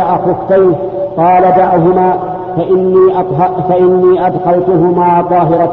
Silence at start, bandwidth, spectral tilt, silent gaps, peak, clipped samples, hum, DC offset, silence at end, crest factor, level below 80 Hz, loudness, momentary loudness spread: 0 s; 4.1 kHz; -11 dB/octave; none; 0 dBFS; under 0.1%; none; under 0.1%; 0 s; 8 dB; -42 dBFS; -10 LUFS; 5 LU